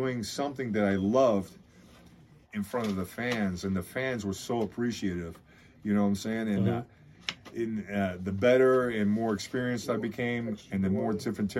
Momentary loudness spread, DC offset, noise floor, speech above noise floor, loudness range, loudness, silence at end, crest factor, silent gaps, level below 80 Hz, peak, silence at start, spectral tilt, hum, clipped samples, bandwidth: 12 LU; under 0.1%; -56 dBFS; 27 dB; 5 LU; -30 LUFS; 0 s; 18 dB; none; -62 dBFS; -12 dBFS; 0 s; -6 dB/octave; none; under 0.1%; 15.5 kHz